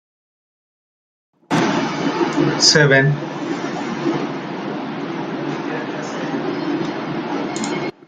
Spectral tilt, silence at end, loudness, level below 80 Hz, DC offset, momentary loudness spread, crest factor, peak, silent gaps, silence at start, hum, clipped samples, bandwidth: -4 dB/octave; 0.15 s; -19 LUFS; -60 dBFS; under 0.1%; 13 LU; 20 dB; 0 dBFS; none; 1.5 s; none; under 0.1%; 9.6 kHz